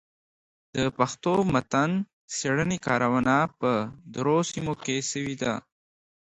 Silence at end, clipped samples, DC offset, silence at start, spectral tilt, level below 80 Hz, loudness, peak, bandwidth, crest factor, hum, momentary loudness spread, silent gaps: 0.7 s; under 0.1%; under 0.1%; 0.75 s; -5 dB/octave; -56 dBFS; -26 LUFS; -6 dBFS; 10 kHz; 20 dB; none; 7 LU; 2.13-2.28 s